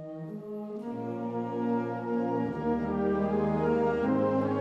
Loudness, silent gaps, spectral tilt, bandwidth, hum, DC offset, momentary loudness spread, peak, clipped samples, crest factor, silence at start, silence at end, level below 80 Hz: -30 LUFS; none; -9.5 dB/octave; 7 kHz; none; under 0.1%; 11 LU; -16 dBFS; under 0.1%; 14 dB; 0 s; 0 s; -54 dBFS